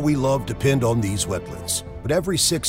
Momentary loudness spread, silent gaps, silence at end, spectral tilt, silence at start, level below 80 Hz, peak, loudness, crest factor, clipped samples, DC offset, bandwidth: 6 LU; none; 0 s; -4.5 dB/octave; 0 s; -42 dBFS; -6 dBFS; -22 LUFS; 16 dB; under 0.1%; under 0.1%; 16 kHz